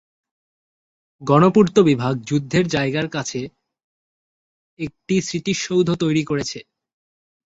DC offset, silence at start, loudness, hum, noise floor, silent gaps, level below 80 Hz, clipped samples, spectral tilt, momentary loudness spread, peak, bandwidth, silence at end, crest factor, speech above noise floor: under 0.1%; 1.2 s; -19 LUFS; none; under -90 dBFS; 3.84-4.77 s; -54 dBFS; under 0.1%; -6 dB/octave; 17 LU; -2 dBFS; 8 kHz; 0.85 s; 20 dB; over 71 dB